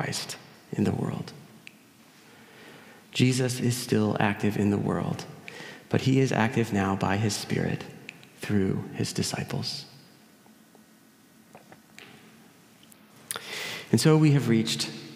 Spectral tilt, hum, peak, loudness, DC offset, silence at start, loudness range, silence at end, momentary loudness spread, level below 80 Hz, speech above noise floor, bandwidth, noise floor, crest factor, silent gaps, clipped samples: -5.5 dB/octave; none; -6 dBFS; -27 LUFS; under 0.1%; 0 s; 10 LU; 0 s; 19 LU; -66 dBFS; 31 dB; 16 kHz; -57 dBFS; 22 dB; none; under 0.1%